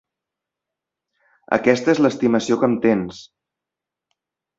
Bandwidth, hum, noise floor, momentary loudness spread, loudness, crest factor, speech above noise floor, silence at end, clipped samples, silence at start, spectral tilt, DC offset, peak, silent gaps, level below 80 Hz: 7.8 kHz; none; -86 dBFS; 6 LU; -18 LUFS; 20 dB; 68 dB; 1.35 s; under 0.1%; 1.5 s; -6 dB/octave; under 0.1%; 0 dBFS; none; -60 dBFS